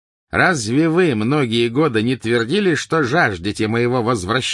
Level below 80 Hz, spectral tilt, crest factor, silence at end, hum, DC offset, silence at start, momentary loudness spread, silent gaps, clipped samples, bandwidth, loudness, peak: -52 dBFS; -5 dB/octave; 14 dB; 0 s; none; under 0.1%; 0.35 s; 3 LU; none; under 0.1%; 11.5 kHz; -17 LUFS; -2 dBFS